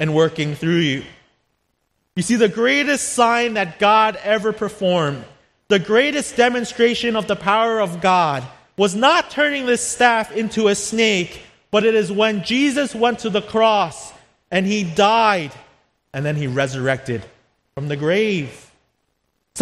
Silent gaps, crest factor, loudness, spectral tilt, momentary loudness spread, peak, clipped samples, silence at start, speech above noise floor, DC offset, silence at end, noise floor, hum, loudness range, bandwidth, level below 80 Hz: none; 18 dB; -18 LUFS; -4 dB/octave; 11 LU; 0 dBFS; under 0.1%; 0 s; 52 dB; under 0.1%; 0 s; -70 dBFS; none; 3 LU; 13 kHz; -56 dBFS